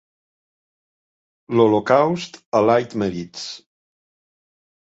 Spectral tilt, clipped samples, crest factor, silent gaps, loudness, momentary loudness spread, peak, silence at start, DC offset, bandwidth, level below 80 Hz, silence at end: -6 dB/octave; under 0.1%; 20 dB; 2.46-2.52 s; -19 LUFS; 15 LU; -2 dBFS; 1.5 s; under 0.1%; 8 kHz; -60 dBFS; 1.3 s